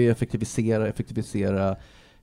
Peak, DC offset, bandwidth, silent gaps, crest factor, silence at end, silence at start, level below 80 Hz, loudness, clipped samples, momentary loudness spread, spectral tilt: -8 dBFS; under 0.1%; 13.5 kHz; none; 16 dB; 0.35 s; 0 s; -48 dBFS; -26 LUFS; under 0.1%; 6 LU; -7 dB/octave